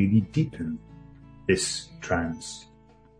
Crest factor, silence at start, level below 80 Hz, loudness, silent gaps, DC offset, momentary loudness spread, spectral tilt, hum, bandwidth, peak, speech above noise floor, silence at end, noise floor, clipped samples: 20 dB; 0 s; -52 dBFS; -28 LUFS; none; under 0.1%; 16 LU; -5 dB/octave; none; 10.5 kHz; -8 dBFS; 29 dB; 0.55 s; -55 dBFS; under 0.1%